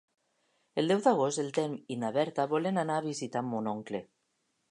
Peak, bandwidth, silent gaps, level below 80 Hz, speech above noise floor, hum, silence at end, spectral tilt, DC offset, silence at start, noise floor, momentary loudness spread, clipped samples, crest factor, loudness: -12 dBFS; 11 kHz; none; -80 dBFS; 47 dB; none; 0.65 s; -5.5 dB/octave; under 0.1%; 0.75 s; -78 dBFS; 10 LU; under 0.1%; 20 dB; -31 LUFS